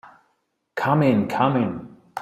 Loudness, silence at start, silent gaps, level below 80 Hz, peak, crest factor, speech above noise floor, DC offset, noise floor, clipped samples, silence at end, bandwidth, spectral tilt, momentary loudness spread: -21 LUFS; 0.05 s; none; -60 dBFS; -4 dBFS; 18 dB; 51 dB; under 0.1%; -71 dBFS; under 0.1%; 0 s; 14 kHz; -8 dB/octave; 17 LU